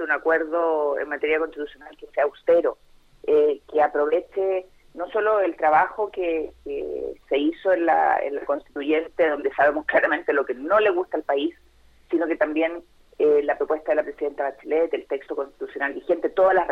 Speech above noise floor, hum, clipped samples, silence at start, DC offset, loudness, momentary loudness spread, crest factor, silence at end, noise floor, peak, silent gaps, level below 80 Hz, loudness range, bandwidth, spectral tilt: 30 dB; none; under 0.1%; 0 s; under 0.1%; -23 LUFS; 10 LU; 18 dB; 0 s; -52 dBFS; -6 dBFS; none; -58 dBFS; 3 LU; 5.2 kHz; -6 dB/octave